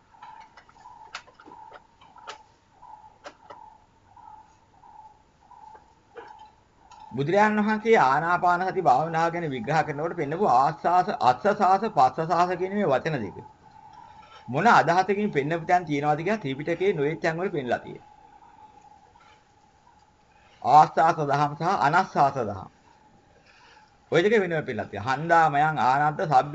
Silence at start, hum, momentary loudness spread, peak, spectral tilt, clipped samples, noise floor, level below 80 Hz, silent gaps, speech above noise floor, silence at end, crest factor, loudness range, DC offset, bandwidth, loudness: 0.2 s; none; 13 LU; -4 dBFS; -6 dB/octave; under 0.1%; -59 dBFS; -62 dBFS; none; 36 dB; 0 s; 22 dB; 7 LU; under 0.1%; 8 kHz; -23 LUFS